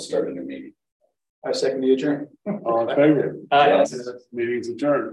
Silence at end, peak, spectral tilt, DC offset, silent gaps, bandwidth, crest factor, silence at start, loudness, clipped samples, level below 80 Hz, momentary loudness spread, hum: 0 s; -4 dBFS; -5.5 dB/octave; under 0.1%; 0.92-1.00 s, 1.30-1.42 s; 11.5 kHz; 18 dB; 0 s; -21 LUFS; under 0.1%; -70 dBFS; 16 LU; none